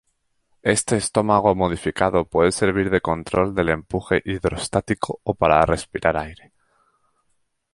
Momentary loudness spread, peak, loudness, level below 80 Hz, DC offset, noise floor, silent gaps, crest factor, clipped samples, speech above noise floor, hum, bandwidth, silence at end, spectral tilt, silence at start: 7 LU; -2 dBFS; -21 LUFS; -42 dBFS; under 0.1%; -69 dBFS; none; 20 dB; under 0.1%; 48 dB; none; 11.5 kHz; 1.4 s; -5 dB/octave; 0.65 s